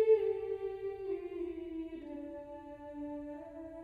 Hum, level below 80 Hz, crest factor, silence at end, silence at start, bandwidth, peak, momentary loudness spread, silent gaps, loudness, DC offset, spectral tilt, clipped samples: none; -64 dBFS; 20 dB; 0 s; 0 s; 4.7 kHz; -18 dBFS; 13 LU; none; -39 LUFS; under 0.1%; -8 dB/octave; under 0.1%